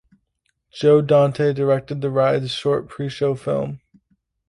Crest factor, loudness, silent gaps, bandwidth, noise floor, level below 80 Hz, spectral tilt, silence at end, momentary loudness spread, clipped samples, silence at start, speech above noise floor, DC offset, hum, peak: 16 dB; -19 LUFS; none; 11 kHz; -71 dBFS; -58 dBFS; -7 dB/octave; 0.7 s; 9 LU; under 0.1%; 0.75 s; 53 dB; under 0.1%; none; -4 dBFS